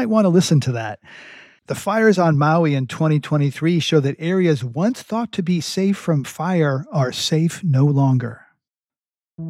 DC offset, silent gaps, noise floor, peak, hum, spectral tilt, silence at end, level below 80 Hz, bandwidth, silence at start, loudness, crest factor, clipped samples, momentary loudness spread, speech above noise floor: under 0.1%; none; under -90 dBFS; -2 dBFS; none; -6.5 dB/octave; 0 s; -64 dBFS; 14.5 kHz; 0 s; -19 LUFS; 16 dB; under 0.1%; 9 LU; over 72 dB